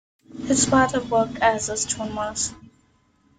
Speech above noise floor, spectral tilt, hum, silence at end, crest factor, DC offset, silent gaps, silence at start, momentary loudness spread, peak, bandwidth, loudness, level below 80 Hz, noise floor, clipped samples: 40 dB; -3 dB/octave; none; 0.8 s; 20 dB; under 0.1%; none; 0.3 s; 9 LU; -4 dBFS; 9.8 kHz; -22 LUFS; -50 dBFS; -62 dBFS; under 0.1%